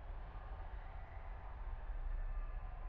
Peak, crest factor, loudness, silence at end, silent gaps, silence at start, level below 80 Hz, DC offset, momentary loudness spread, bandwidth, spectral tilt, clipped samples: -34 dBFS; 12 dB; -51 LUFS; 0 s; none; 0 s; -44 dBFS; under 0.1%; 5 LU; 4 kHz; -6 dB/octave; under 0.1%